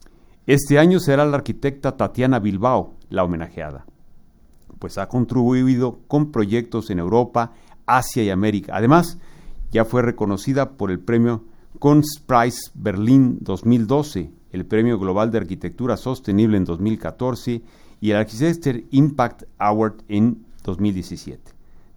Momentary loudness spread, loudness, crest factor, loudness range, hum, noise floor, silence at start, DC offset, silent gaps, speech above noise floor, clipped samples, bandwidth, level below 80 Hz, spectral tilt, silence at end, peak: 13 LU; -20 LUFS; 20 dB; 4 LU; none; -48 dBFS; 0.45 s; under 0.1%; none; 29 dB; under 0.1%; over 20 kHz; -42 dBFS; -7 dB/octave; 0.6 s; 0 dBFS